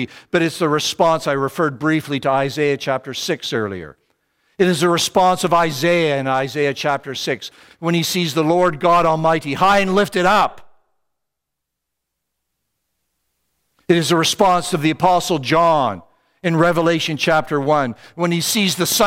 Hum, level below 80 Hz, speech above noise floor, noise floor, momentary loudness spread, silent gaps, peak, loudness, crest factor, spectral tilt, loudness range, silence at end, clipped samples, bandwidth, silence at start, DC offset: none; -52 dBFS; 63 dB; -80 dBFS; 8 LU; none; 0 dBFS; -17 LUFS; 18 dB; -4.5 dB/octave; 4 LU; 0 s; under 0.1%; 16 kHz; 0 s; under 0.1%